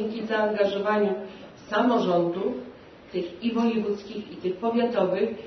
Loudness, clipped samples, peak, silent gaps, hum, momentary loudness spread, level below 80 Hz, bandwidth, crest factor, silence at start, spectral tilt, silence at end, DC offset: -26 LUFS; under 0.1%; -10 dBFS; none; none; 12 LU; -64 dBFS; 6.4 kHz; 16 dB; 0 s; -7 dB/octave; 0 s; under 0.1%